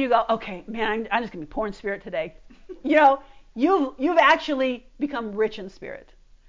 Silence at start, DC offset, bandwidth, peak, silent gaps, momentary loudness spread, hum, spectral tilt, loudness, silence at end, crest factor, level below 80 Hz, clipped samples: 0 s; under 0.1%; 7.6 kHz; -6 dBFS; none; 19 LU; none; -5 dB/octave; -23 LUFS; 0.45 s; 18 dB; -52 dBFS; under 0.1%